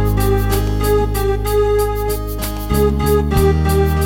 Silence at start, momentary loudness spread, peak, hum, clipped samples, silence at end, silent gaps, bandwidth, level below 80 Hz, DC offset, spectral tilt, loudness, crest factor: 0 s; 6 LU; -2 dBFS; none; under 0.1%; 0 s; none; 17 kHz; -20 dBFS; under 0.1%; -6.5 dB/octave; -16 LUFS; 14 dB